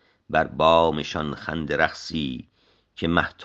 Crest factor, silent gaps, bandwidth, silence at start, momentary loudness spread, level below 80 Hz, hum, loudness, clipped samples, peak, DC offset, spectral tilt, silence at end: 22 dB; none; 8 kHz; 0.3 s; 12 LU; -50 dBFS; none; -23 LUFS; under 0.1%; -2 dBFS; under 0.1%; -5.5 dB/octave; 0 s